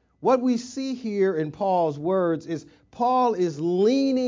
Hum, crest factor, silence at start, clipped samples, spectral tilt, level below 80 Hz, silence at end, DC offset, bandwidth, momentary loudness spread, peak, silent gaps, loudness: none; 14 dB; 0.2 s; under 0.1%; -6.5 dB/octave; -66 dBFS; 0 s; under 0.1%; 7.6 kHz; 9 LU; -10 dBFS; none; -24 LUFS